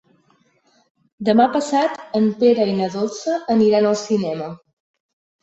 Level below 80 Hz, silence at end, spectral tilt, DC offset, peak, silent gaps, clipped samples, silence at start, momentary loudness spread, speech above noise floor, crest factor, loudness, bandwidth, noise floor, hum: -62 dBFS; 0.85 s; -6 dB/octave; under 0.1%; -2 dBFS; none; under 0.1%; 1.2 s; 9 LU; 42 dB; 16 dB; -18 LUFS; 8.2 kHz; -60 dBFS; none